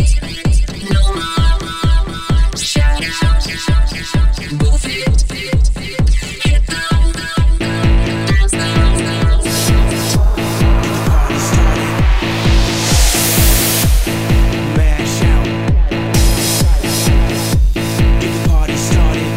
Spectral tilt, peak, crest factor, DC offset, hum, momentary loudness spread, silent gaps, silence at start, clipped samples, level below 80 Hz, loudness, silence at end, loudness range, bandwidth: -4.5 dB/octave; 0 dBFS; 12 dB; 0.3%; none; 4 LU; none; 0 s; under 0.1%; -14 dBFS; -14 LUFS; 0 s; 3 LU; 16.5 kHz